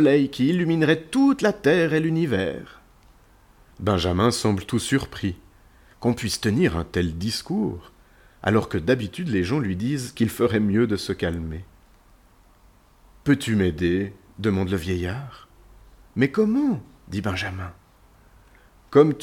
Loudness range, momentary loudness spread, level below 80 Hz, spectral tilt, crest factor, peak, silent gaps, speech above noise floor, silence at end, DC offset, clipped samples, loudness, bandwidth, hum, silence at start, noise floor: 4 LU; 11 LU; -46 dBFS; -6 dB/octave; 20 dB; -4 dBFS; none; 33 dB; 0 s; under 0.1%; under 0.1%; -23 LUFS; 17 kHz; none; 0 s; -55 dBFS